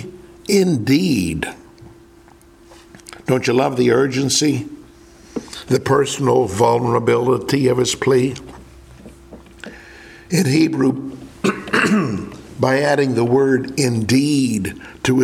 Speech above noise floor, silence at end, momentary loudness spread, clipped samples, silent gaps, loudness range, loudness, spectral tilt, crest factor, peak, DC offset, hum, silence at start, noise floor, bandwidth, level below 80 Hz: 30 dB; 0 s; 16 LU; under 0.1%; none; 4 LU; -17 LUFS; -5 dB/octave; 18 dB; 0 dBFS; under 0.1%; none; 0 s; -46 dBFS; 16 kHz; -48 dBFS